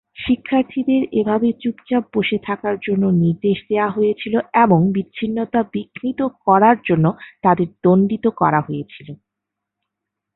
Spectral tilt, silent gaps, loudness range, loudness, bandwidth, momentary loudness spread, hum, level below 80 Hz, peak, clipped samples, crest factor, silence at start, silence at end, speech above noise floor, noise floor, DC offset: -12.5 dB/octave; none; 2 LU; -18 LUFS; 4.1 kHz; 9 LU; none; -54 dBFS; -2 dBFS; under 0.1%; 16 dB; 0.2 s; 1.2 s; 64 dB; -82 dBFS; under 0.1%